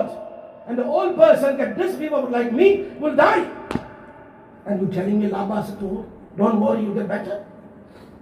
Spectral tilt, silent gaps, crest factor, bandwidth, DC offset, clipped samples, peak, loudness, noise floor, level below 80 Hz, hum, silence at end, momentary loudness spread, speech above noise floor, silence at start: -7.5 dB/octave; none; 20 dB; 14 kHz; under 0.1%; under 0.1%; -2 dBFS; -20 LUFS; -44 dBFS; -56 dBFS; none; 0.05 s; 16 LU; 25 dB; 0 s